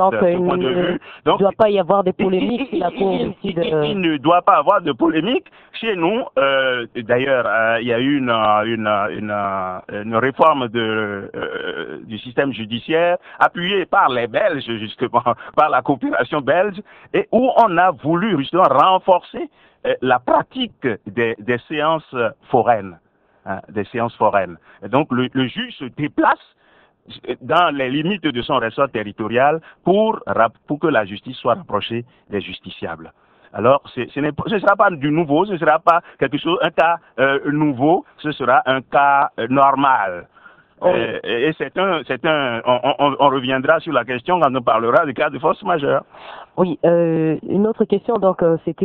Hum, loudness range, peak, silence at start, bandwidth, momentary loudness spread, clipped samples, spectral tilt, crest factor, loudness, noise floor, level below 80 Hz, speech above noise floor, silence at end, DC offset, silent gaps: none; 4 LU; 0 dBFS; 0 s; 5.6 kHz; 11 LU; under 0.1%; -8.5 dB/octave; 18 dB; -18 LUFS; -55 dBFS; -56 dBFS; 37 dB; 0 s; under 0.1%; none